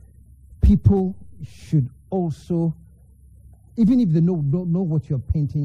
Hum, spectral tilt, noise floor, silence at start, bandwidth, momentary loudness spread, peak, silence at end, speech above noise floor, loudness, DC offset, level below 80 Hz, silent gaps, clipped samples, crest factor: none; -10.5 dB/octave; -49 dBFS; 0.6 s; 7.4 kHz; 16 LU; -4 dBFS; 0 s; 29 dB; -21 LUFS; under 0.1%; -30 dBFS; none; under 0.1%; 18 dB